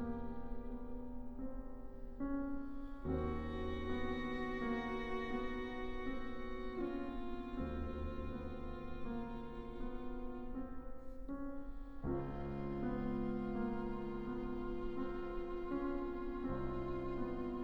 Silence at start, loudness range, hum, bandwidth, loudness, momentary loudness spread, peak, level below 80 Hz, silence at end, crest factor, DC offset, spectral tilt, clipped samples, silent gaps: 0 s; 5 LU; none; 18.5 kHz; -44 LUFS; 8 LU; -28 dBFS; -48 dBFS; 0 s; 14 dB; under 0.1%; -8.5 dB/octave; under 0.1%; none